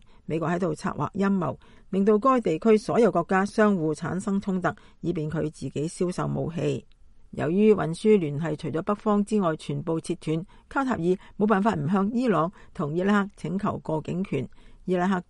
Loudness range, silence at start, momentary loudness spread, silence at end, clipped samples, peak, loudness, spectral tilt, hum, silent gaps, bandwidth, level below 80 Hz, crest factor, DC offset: 4 LU; 0.3 s; 10 LU; 0.1 s; under 0.1%; -8 dBFS; -26 LUFS; -7.5 dB/octave; none; none; 11 kHz; -54 dBFS; 18 dB; under 0.1%